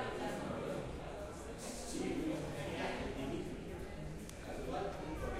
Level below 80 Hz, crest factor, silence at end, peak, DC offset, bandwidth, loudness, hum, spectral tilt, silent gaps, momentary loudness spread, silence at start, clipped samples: -52 dBFS; 14 dB; 0 s; -28 dBFS; under 0.1%; 16 kHz; -43 LUFS; none; -5 dB/octave; none; 7 LU; 0 s; under 0.1%